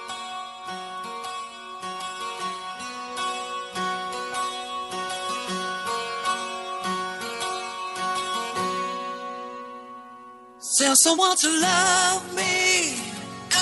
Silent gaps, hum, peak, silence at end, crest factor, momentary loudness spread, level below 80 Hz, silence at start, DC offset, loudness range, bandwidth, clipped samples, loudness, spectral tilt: none; none; -2 dBFS; 0 s; 24 dB; 17 LU; -70 dBFS; 0 s; under 0.1%; 11 LU; 11.5 kHz; under 0.1%; -24 LUFS; -1 dB/octave